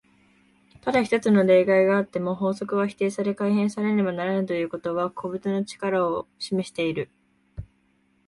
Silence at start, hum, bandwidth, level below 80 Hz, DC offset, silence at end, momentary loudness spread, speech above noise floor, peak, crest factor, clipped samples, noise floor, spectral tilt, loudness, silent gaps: 0.85 s; none; 11.5 kHz; -58 dBFS; under 0.1%; 0.65 s; 12 LU; 42 dB; -8 dBFS; 16 dB; under 0.1%; -65 dBFS; -6.5 dB/octave; -24 LUFS; none